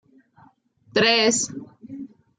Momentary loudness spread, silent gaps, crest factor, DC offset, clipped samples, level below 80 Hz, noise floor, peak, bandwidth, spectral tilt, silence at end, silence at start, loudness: 22 LU; none; 18 dB; under 0.1%; under 0.1%; -70 dBFS; -57 dBFS; -6 dBFS; 9.6 kHz; -2 dB/octave; 0.3 s; 0.95 s; -20 LUFS